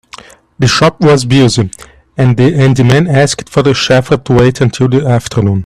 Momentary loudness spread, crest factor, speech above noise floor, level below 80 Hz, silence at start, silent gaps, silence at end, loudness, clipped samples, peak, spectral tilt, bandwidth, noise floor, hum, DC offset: 5 LU; 10 dB; 26 dB; -36 dBFS; 0.6 s; none; 0 s; -9 LUFS; under 0.1%; 0 dBFS; -6 dB/octave; 12 kHz; -35 dBFS; none; under 0.1%